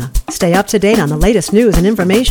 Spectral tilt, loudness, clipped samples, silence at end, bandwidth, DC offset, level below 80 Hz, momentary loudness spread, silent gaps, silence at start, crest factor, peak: -5.5 dB/octave; -12 LUFS; under 0.1%; 0 s; 19.5 kHz; under 0.1%; -22 dBFS; 3 LU; none; 0 s; 12 dB; 0 dBFS